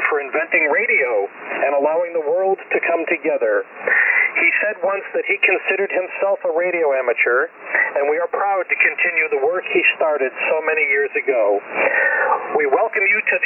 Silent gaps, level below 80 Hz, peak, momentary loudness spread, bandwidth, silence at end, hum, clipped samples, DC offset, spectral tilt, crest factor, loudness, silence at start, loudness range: none; -80 dBFS; -4 dBFS; 5 LU; 3.2 kHz; 0 s; none; under 0.1%; under 0.1%; -6 dB/octave; 14 dB; -17 LUFS; 0 s; 1 LU